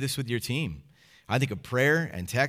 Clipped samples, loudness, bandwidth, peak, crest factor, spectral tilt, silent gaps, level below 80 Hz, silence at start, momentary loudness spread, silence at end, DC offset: under 0.1%; -28 LUFS; 16.5 kHz; -10 dBFS; 18 dB; -5 dB/octave; none; -58 dBFS; 0 s; 8 LU; 0 s; under 0.1%